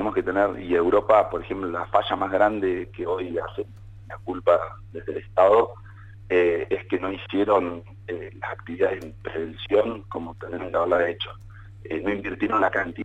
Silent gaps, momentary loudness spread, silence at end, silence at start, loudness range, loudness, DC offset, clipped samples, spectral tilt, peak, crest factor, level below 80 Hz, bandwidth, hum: none; 15 LU; 0 s; 0 s; 4 LU; -24 LUFS; under 0.1%; under 0.1%; -7 dB/octave; -6 dBFS; 18 dB; -50 dBFS; 8 kHz; none